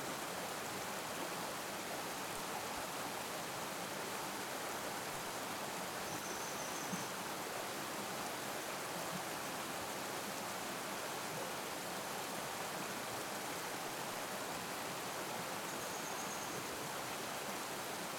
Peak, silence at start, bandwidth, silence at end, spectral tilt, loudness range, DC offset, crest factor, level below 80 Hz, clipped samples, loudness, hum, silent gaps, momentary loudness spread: -28 dBFS; 0 s; 19 kHz; 0 s; -2 dB/octave; 0 LU; under 0.1%; 14 dB; -74 dBFS; under 0.1%; -42 LUFS; none; none; 1 LU